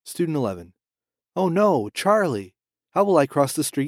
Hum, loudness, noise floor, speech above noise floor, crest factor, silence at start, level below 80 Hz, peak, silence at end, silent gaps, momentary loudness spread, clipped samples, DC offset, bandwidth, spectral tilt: none; -22 LUFS; under -90 dBFS; over 69 dB; 20 dB; 0.05 s; -66 dBFS; -4 dBFS; 0 s; none; 11 LU; under 0.1%; under 0.1%; 16 kHz; -5.5 dB/octave